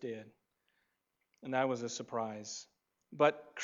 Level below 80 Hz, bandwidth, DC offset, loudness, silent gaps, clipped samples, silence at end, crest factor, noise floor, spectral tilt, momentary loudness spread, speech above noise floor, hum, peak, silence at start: -90 dBFS; 7.8 kHz; under 0.1%; -36 LUFS; none; under 0.1%; 0 s; 24 dB; -84 dBFS; -4 dB/octave; 17 LU; 47 dB; none; -14 dBFS; 0 s